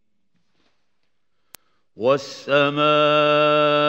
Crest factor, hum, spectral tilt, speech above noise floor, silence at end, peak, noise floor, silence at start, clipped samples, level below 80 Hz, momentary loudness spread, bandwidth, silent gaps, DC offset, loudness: 16 dB; none; -5.5 dB/octave; 58 dB; 0 s; -6 dBFS; -76 dBFS; 2 s; under 0.1%; -74 dBFS; 6 LU; 15 kHz; none; under 0.1%; -18 LUFS